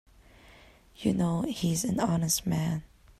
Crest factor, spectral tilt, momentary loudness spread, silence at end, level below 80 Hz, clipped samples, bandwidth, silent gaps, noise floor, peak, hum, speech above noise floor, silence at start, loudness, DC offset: 16 dB; -5 dB/octave; 6 LU; 0.35 s; -54 dBFS; under 0.1%; 14.5 kHz; none; -56 dBFS; -14 dBFS; none; 28 dB; 0.5 s; -29 LUFS; under 0.1%